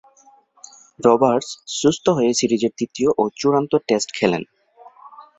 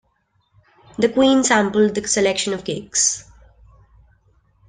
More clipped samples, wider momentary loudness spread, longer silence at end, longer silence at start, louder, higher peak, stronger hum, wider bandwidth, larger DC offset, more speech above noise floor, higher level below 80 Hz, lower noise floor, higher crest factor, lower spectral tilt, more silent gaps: neither; second, 7 LU vs 10 LU; second, 0.15 s vs 1.45 s; about the same, 1 s vs 1 s; about the same, -19 LUFS vs -18 LUFS; about the same, -2 dBFS vs -2 dBFS; neither; second, 8.4 kHz vs 10.5 kHz; neither; second, 35 dB vs 48 dB; second, -60 dBFS vs -54 dBFS; second, -53 dBFS vs -65 dBFS; about the same, 18 dB vs 18 dB; first, -4.5 dB/octave vs -3 dB/octave; neither